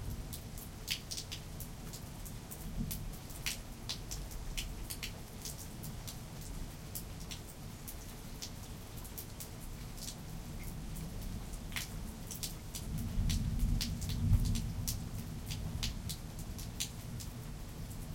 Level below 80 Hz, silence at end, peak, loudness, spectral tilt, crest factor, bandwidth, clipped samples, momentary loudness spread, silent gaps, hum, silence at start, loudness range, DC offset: -44 dBFS; 0 s; -16 dBFS; -42 LUFS; -4 dB/octave; 24 dB; 17 kHz; under 0.1%; 10 LU; none; none; 0 s; 9 LU; under 0.1%